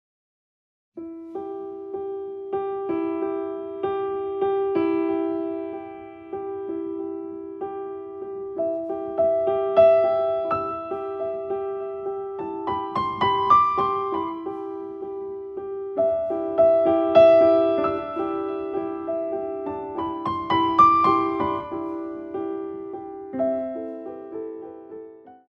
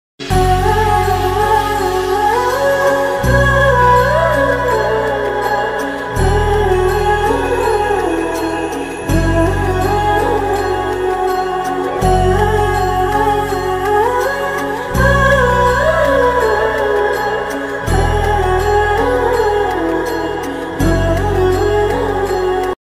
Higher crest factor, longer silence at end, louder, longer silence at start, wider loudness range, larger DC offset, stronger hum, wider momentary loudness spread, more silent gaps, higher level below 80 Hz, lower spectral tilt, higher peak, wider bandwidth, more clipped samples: first, 20 dB vs 14 dB; about the same, 0.1 s vs 0.1 s; second, -24 LUFS vs -14 LUFS; first, 0.95 s vs 0.2 s; first, 11 LU vs 3 LU; neither; neither; first, 17 LU vs 6 LU; neither; second, -60 dBFS vs -24 dBFS; first, -7.5 dB/octave vs -5.5 dB/octave; second, -4 dBFS vs 0 dBFS; second, 6.4 kHz vs 16 kHz; neither